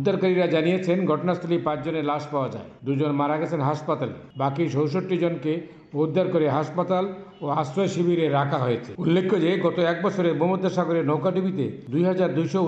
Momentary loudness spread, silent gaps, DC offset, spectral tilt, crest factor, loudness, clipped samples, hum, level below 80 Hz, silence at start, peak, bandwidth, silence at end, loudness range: 7 LU; none; under 0.1%; -7.5 dB/octave; 14 dB; -24 LUFS; under 0.1%; none; -66 dBFS; 0 s; -10 dBFS; 8 kHz; 0 s; 3 LU